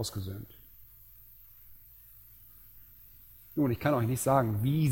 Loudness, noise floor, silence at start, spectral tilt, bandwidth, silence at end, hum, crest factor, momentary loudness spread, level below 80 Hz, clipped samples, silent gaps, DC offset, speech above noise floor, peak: -30 LUFS; -55 dBFS; 0 s; -6.5 dB/octave; 17 kHz; 0 s; none; 22 dB; 26 LU; -58 dBFS; under 0.1%; none; under 0.1%; 26 dB; -12 dBFS